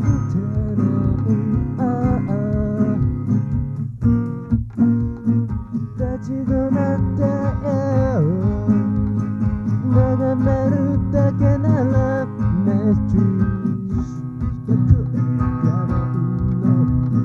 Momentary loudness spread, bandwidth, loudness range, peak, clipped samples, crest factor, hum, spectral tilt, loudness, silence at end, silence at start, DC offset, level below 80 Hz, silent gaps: 6 LU; 6.8 kHz; 3 LU; -2 dBFS; under 0.1%; 16 dB; none; -11 dB/octave; -19 LUFS; 0 s; 0 s; under 0.1%; -32 dBFS; none